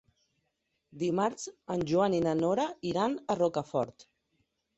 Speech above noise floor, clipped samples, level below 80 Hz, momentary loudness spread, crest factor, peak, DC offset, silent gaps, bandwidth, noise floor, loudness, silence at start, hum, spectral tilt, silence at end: 50 dB; under 0.1%; -66 dBFS; 8 LU; 18 dB; -14 dBFS; under 0.1%; none; 8.2 kHz; -80 dBFS; -31 LUFS; 0.95 s; none; -6 dB/octave; 0.75 s